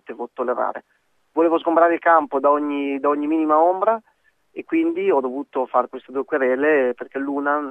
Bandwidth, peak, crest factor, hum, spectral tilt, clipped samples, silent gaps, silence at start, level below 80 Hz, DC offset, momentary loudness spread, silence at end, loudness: 3.8 kHz; -4 dBFS; 18 dB; none; -7 dB/octave; under 0.1%; none; 0.1 s; -76 dBFS; under 0.1%; 11 LU; 0 s; -20 LUFS